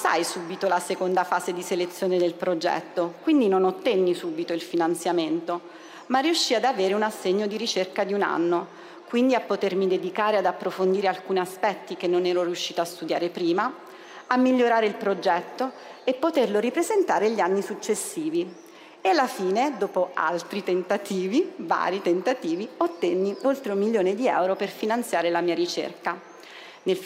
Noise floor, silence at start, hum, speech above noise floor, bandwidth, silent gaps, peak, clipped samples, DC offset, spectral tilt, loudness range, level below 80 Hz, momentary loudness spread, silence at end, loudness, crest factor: -45 dBFS; 0 s; none; 20 dB; 16 kHz; none; -6 dBFS; under 0.1%; under 0.1%; -4.5 dB/octave; 2 LU; -82 dBFS; 7 LU; 0 s; -25 LUFS; 18 dB